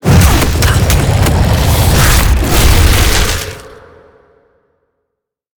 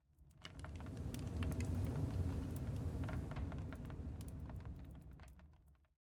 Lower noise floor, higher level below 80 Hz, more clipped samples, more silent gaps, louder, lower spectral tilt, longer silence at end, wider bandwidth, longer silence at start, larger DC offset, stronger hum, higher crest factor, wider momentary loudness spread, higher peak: first, -74 dBFS vs -68 dBFS; first, -14 dBFS vs -52 dBFS; neither; neither; first, -10 LUFS vs -46 LUFS; second, -4.5 dB/octave vs -7 dB/octave; first, 1.85 s vs 0.3 s; first, over 20 kHz vs 18 kHz; second, 0.05 s vs 0.2 s; neither; neither; second, 10 dB vs 16 dB; second, 6 LU vs 16 LU; first, 0 dBFS vs -30 dBFS